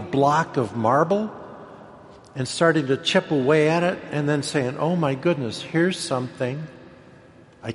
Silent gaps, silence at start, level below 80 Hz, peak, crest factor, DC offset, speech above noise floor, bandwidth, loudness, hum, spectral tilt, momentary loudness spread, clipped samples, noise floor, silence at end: none; 0 s; -62 dBFS; -4 dBFS; 18 dB; under 0.1%; 27 dB; 11.5 kHz; -22 LUFS; none; -5.5 dB/octave; 17 LU; under 0.1%; -49 dBFS; 0 s